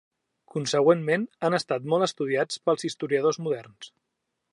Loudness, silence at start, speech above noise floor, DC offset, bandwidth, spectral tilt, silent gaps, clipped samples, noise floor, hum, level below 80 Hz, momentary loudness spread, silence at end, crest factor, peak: -26 LUFS; 0.55 s; 55 dB; under 0.1%; 11 kHz; -5 dB/octave; none; under 0.1%; -81 dBFS; none; -78 dBFS; 13 LU; 0.65 s; 20 dB; -6 dBFS